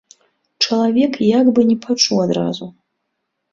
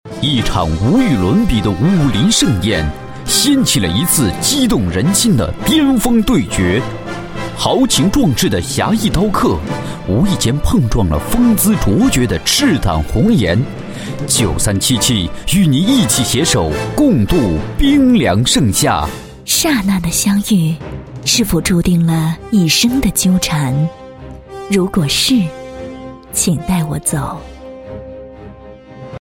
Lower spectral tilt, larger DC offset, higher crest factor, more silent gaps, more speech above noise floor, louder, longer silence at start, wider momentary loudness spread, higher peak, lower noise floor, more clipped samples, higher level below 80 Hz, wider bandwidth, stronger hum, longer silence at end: about the same, -4.5 dB/octave vs -4.5 dB/octave; neither; about the same, 16 dB vs 14 dB; neither; first, 59 dB vs 22 dB; second, -16 LUFS vs -13 LUFS; first, 0.6 s vs 0.05 s; second, 10 LU vs 13 LU; about the same, -2 dBFS vs 0 dBFS; first, -74 dBFS vs -35 dBFS; neither; second, -60 dBFS vs -28 dBFS; second, 7.6 kHz vs 17 kHz; neither; first, 0.8 s vs 0.05 s